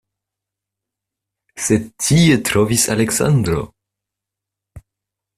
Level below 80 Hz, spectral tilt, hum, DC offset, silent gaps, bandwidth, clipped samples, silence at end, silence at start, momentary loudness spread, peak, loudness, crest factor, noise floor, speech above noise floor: -44 dBFS; -4.5 dB/octave; none; under 0.1%; none; 15.5 kHz; under 0.1%; 0.6 s; 1.55 s; 10 LU; -2 dBFS; -16 LUFS; 18 dB; -84 dBFS; 69 dB